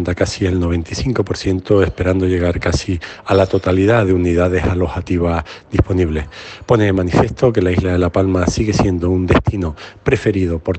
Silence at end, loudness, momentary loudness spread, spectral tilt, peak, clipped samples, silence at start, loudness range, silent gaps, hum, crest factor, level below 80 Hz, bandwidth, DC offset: 0 s; -16 LUFS; 6 LU; -7 dB/octave; 0 dBFS; under 0.1%; 0 s; 2 LU; none; none; 16 dB; -32 dBFS; 8.6 kHz; under 0.1%